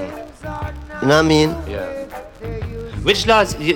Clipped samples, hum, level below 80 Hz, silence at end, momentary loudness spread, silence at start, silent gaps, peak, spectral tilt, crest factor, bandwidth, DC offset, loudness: under 0.1%; none; -34 dBFS; 0 s; 17 LU; 0 s; none; -2 dBFS; -5 dB/octave; 16 dB; 17.5 kHz; under 0.1%; -18 LUFS